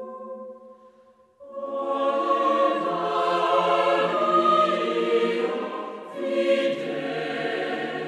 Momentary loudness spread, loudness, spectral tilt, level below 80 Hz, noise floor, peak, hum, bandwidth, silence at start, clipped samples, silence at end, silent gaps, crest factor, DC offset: 15 LU; -23 LUFS; -5 dB/octave; -80 dBFS; -56 dBFS; -8 dBFS; none; 10.5 kHz; 0 s; under 0.1%; 0 s; none; 16 dB; under 0.1%